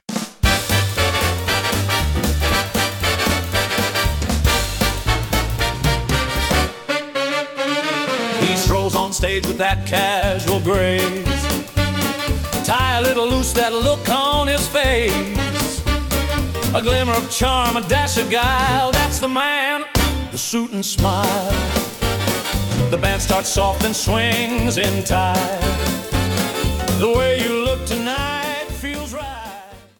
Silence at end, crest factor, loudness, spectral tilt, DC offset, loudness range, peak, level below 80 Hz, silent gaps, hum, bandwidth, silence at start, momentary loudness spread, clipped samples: 0.2 s; 16 dB; -19 LUFS; -4 dB/octave; under 0.1%; 2 LU; -2 dBFS; -28 dBFS; none; none; 18 kHz; 0.1 s; 5 LU; under 0.1%